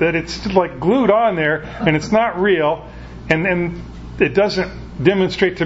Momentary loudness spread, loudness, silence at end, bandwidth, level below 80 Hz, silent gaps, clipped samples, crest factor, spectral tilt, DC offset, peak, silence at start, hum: 11 LU; -17 LUFS; 0 s; 8 kHz; -38 dBFS; none; under 0.1%; 18 dB; -6.5 dB/octave; under 0.1%; 0 dBFS; 0 s; none